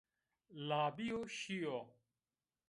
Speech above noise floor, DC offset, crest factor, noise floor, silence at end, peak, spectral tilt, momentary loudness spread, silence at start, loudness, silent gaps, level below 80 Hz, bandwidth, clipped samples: over 48 dB; under 0.1%; 18 dB; under -90 dBFS; 0.8 s; -26 dBFS; -5 dB/octave; 15 LU; 0.5 s; -42 LUFS; none; -80 dBFS; 11.5 kHz; under 0.1%